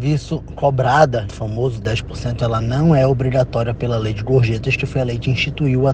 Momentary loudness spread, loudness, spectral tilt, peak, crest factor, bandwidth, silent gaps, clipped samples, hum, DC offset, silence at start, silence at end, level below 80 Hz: 8 LU; -18 LUFS; -7 dB/octave; 0 dBFS; 18 dB; 8.8 kHz; none; under 0.1%; none; under 0.1%; 0 s; 0 s; -34 dBFS